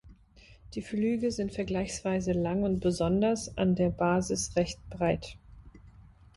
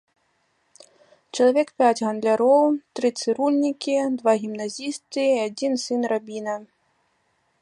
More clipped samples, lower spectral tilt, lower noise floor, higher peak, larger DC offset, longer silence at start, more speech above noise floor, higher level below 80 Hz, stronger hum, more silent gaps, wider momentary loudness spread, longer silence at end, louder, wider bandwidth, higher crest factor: neither; first, -6 dB/octave vs -4 dB/octave; second, -57 dBFS vs -68 dBFS; second, -14 dBFS vs -6 dBFS; neither; second, 0.05 s vs 1.35 s; second, 27 dB vs 47 dB; first, -50 dBFS vs -78 dBFS; neither; neither; second, 7 LU vs 11 LU; second, 0.35 s vs 0.95 s; second, -30 LUFS vs -22 LUFS; about the same, 11.5 kHz vs 11.5 kHz; about the same, 16 dB vs 16 dB